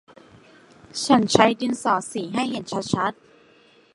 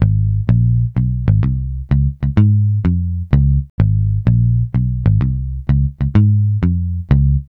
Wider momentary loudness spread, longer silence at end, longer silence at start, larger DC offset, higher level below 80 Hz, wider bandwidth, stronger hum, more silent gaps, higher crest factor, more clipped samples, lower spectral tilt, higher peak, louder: first, 11 LU vs 5 LU; first, 0.8 s vs 0.1 s; first, 0.95 s vs 0 s; neither; second, -60 dBFS vs -22 dBFS; first, 11.5 kHz vs 3.8 kHz; neither; second, none vs 3.70-3.78 s; first, 24 dB vs 14 dB; neither; second, -4.5 dB/octave vs -11.5 dB/octave; about the same, 0 dBFS vs 0 dBFS; second, -22 LUFS vs -16 LUFS